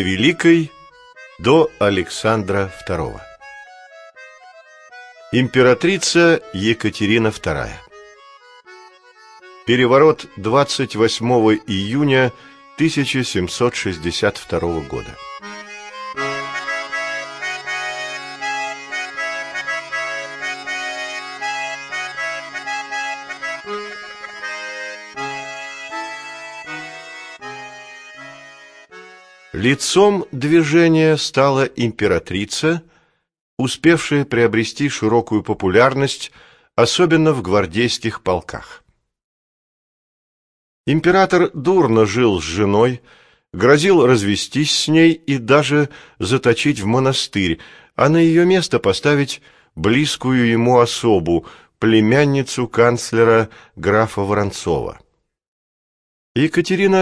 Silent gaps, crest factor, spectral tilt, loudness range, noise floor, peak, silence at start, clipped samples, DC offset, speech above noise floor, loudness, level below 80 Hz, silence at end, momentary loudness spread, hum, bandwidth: 33.41-33.57 s, 39.24-40.84 s, 55.48-56.35 s; 18 dB; -5 dB/octave; 10 LU; -59 dBFS; 0 dBFS; 0 s; under 0.1%; under 0.1%; 44 dB; -17 LUFS; -48 dBFS; 0 s; 16 LU; none; 11 kHz